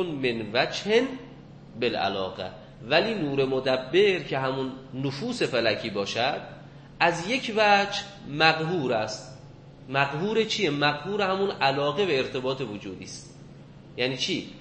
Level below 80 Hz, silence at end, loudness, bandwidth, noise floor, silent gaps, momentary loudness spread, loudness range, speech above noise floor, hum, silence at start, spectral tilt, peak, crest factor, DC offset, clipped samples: -58 dBFS; 0 s; -26 LUFS; 8.8 kHz; -47 dBFS; none; 16 LU; 3 LU; 21 dB; none; 0 s; -4.5 dB/octave; -4 dBFS; 24 dB; under 0.1%; under 0.1%